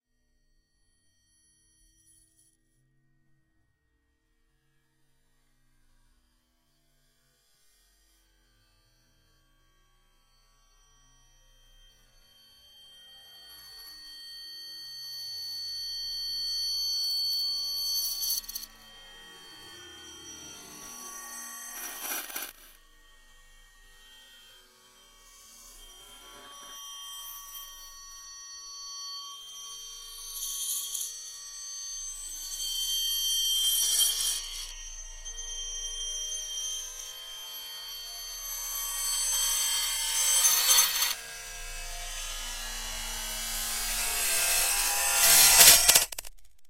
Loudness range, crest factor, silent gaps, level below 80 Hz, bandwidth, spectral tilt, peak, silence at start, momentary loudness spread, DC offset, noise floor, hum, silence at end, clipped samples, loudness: 19 LU; 32 dB; none; -52 dBFS; 16 kHz; 2 dB/octave; 0 dBFS; 12.75 s; 23 LU; under 0.1%; -74 dBFS; none; 0 s; under 0.1%; -26 LUFS